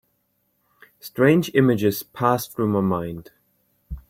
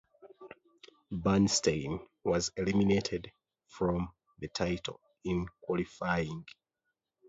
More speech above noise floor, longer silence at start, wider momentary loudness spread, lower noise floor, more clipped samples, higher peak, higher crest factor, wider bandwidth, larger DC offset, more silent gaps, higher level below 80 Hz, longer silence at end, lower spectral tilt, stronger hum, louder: second, 49 dB vs 54 dB; first, 1.05 s vs 0.25 s; first, 19 LU vs 16 LU; second, -70 dBFS vs -86 dBFS; neither; first, -4 dBFS vs -14 dBFS; about the same, 20 dB vs 20 dB; first, 16.5 kHz vs 8 kHz; neither; neither; first, -48 dBFS vs -54 dBFS; second, 0.1 s vs 0.8 s; first, -6.5 dB/octave vs -5 dB/octave; neither; first, -21 LUFS vs -33 LUFS